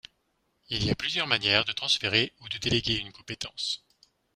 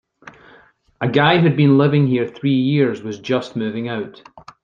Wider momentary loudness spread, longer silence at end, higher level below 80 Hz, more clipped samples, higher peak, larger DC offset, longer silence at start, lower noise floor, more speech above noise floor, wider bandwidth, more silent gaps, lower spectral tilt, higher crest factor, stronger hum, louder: about the same, 12 LU vs 12 LU; first, 0.6 s vs 0.25 s; about the same, -54 dBFS vs -58 dBFS; neither; second, -6 dBFS vs -2 dBFS; neither; first, 0.7 s vs 0.25 s; first, -74 dBFS vs -51 dBFS; first, 45 dB vs 34 dB; first, 15 kHz vs 7.2 kHz; neither; second, -3.5 dB/octave vs -8 dB/octave; first, 26 dB vs 16 dB; neither; second, -27 LUFS vs -17 LUFS